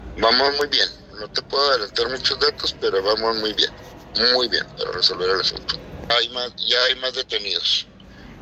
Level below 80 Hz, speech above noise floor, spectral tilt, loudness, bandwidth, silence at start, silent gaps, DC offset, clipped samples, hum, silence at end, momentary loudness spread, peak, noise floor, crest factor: -48 dBFS; 21 dB; -2 dB/octave; -20 LUFS; 14.5 kHz; 0 s; none; under 0.1%; under 0.1%; none; 0 s; 10 LU; -4 dBFS; -42 dBFS; 18 dB